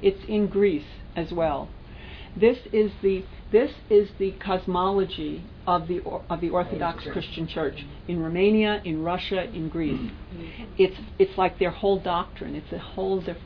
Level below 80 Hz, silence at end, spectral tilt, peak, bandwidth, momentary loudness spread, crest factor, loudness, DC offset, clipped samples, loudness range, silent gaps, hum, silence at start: -44 dBFS; 0 s; -9 dB/octave; -8 dBFS; 5.4 kHz; 14 LU; 18 dB; -26 LUFS; under 0.1%; under 0.1%; 3 LU; none; none; 0 s